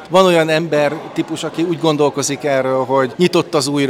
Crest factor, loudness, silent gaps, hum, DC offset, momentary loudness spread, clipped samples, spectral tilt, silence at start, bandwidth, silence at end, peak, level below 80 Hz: 16 dB; -16 LUFS; none; none; under 0.1%; 9 LU; under 0.1%; -4.5 dB/octave; 0 s; 16.5 kHz; 0 s; 0 dBFS; -60 dBFS